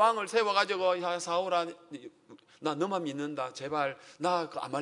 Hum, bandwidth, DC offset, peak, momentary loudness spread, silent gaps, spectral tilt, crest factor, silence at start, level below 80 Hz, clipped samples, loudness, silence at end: none; 11 kHz; under 0.1%; -10 dBFS; 12 LU; none; -4 dB/octave; 22 dB; 0 s; -80 dBFS; under 0.1%; -31 LUFS; 0 s